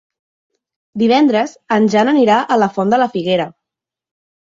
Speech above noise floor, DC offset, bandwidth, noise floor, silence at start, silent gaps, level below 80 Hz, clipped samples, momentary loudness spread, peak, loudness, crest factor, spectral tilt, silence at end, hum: 71 dB; under 0.1%; 7.6 kHz; -84 dBFS; 0.95 s; none; -60 dBFS; under 0.1%; 7 LU; -2 dBFS; -14 LUFS; 14 dB; -6 dB/octave; 0.9 s; none